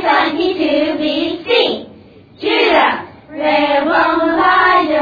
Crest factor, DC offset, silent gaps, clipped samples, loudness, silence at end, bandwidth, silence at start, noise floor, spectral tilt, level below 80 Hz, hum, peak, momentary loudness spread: 14 dB; under 0.1%; none; under 0.1%; -13 LUFS; 0 s; 5 kHz; 0 s; -41 dBFS; -5.5 dB/octave; -50 dBFS; none; 0 dBFS; 9 LU